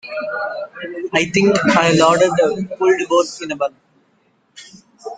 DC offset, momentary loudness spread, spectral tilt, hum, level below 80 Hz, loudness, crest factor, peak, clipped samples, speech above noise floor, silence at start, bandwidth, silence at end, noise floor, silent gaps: under 0.1%; 14 LU; -4.5 dB/octave; none; -56 dBFS; -16 LUFS; 18 dB; 0 dBFS; under 0.1%; 43 dB; 0.05 s; 9.4 kHz; 0 s; -60 dBFS; none